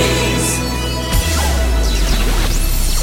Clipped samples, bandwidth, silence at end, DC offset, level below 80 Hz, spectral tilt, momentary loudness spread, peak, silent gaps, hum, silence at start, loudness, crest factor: under 0.1%; 16.5 kHz; 0 s; under 0.1%; -16 dBFS; -3.5 dB/octave; 3 LU; -2 dBFS; none; none; 0 s; -17 LUFS; 12 dB